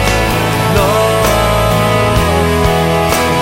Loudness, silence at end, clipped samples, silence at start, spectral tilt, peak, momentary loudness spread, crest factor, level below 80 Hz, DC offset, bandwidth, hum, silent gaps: -11 LUFS; 0 s; under 0.1%; 0 s; -5 dB/octave; 0 dBFS; 1 LU; 12 dB; -22 dBFS; under 0.1%; 16.5 kHz; none; none